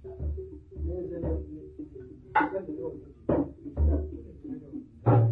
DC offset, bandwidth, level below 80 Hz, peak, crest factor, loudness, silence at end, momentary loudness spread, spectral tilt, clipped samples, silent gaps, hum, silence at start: under 0.1%; 3.9 kHz; -36 dBFS; -10 dBFS; 20 dB; -31 LUFS; 0 s; 16 LU; -11.5 dB/octave; under 0.1%; none; none; 0 s